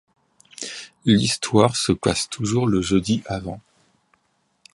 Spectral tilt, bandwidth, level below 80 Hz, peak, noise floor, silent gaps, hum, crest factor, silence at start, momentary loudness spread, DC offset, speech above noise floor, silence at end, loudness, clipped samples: -5 dB/octave; 11.5 kHz; -46 dBFS; -2 dBFS; -68 dBFS; none; none; 22 dB; 0.6 s; 14 LU; under 0.1%; 48 dB; 1.15 s; -21 LUFS; under 0.1%